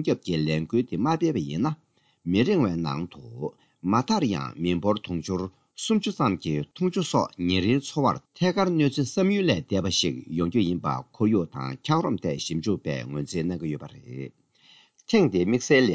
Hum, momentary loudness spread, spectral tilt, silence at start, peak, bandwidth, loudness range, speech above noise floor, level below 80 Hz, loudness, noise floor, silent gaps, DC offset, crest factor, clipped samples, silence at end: none; 11 LU; -5.5 dB/octave; 0 s; -8 dBFS; 8 kHz; 4 LU; 32 dB; -50 dBFS; -26 LUFS; -57 dBFS; none; under 0.1%; 18 dB; under 0.1%; 0 s